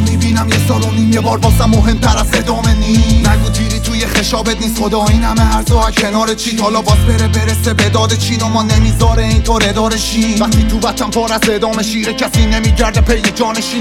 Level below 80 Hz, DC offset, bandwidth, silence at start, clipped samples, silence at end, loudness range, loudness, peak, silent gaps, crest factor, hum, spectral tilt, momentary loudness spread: -16 dBFS; under 0.1%; 17.5 kHz; 0 s; under 0.1%; 0 s; 1 LU; -12 LUFS; 0 dBFS; none; 10 dB; none; -5 dB/octave; 4 LU